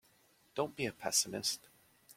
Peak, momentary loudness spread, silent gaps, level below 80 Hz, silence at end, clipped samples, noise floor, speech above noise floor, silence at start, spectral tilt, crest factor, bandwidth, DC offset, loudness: -16 dBFS; 11 LU; none; -74 dBFS; 0.05 s; under 0.1%; -69 dBFS; 33 dB; 0.55 s; -1.5 dB/octave; 24 dB; 16.5 kHz; under 0.1%; -36 LUFS